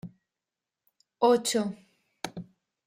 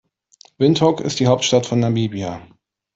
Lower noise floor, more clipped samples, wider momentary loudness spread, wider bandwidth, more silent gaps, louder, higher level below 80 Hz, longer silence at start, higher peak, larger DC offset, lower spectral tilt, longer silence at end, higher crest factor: first, -89 dBFS vs -52 dBFS; neither; first, 23 LU vs 12 LU; first, 16 kHz vs 8 kHz; neither; second, -27 LUFS vs -18 LUFS; second, -72 dBFS vs -56 dBFS; second, 0.05 s vs 0.6 s; second, -10 dBFS vs -2 dBFS; neither; second, -4 dB/octave vs -5.5 dB/octave; about the same, 0.45 s vs 0.5 s; about the same, 20 dB vs 16 dB